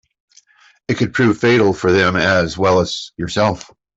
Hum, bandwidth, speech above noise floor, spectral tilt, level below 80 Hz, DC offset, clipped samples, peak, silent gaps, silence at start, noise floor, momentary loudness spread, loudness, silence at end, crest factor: none; 8 kHz; 38 dB; -5.5 dB/octave; -48 dBFS; under 0.1%; under 0.1%; -2 dBFS; none; 0.9 s; -53 dBFS; 10 LU; -16 LUFS; 0.35 s; 14 dB